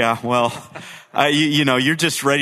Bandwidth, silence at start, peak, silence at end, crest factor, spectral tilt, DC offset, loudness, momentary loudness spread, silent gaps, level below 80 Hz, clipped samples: 14 kHz; 0 s; 0 dBFS; 0 s; 18 dB; -4 dB/octave; under 0.1%; -17 LUFS; 17 LU; none; -60 dBFS; under 0.1%